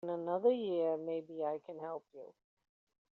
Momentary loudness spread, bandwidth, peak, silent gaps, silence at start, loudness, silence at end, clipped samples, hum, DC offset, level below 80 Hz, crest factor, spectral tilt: 21 LU; 4.3 kHz; -20 dBFS; none; 0.05 s; -37 LUFS; 0.8 s; under 0.1%; none; under 0.1%; -88 dBFS; 18 dB; -5.5 dB/octave